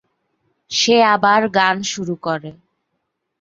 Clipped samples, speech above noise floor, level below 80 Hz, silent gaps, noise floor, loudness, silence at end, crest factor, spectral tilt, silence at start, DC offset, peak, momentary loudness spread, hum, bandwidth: under 0.1%; 58 dB; -62 dBFS; none; -74 dBFS; -16 LUFS; 0.9 s; 18 dB; -3 dB/octave; 0.7 s; under 0.1%; -2 dBFS; 12 LU; none; 7.8 kHz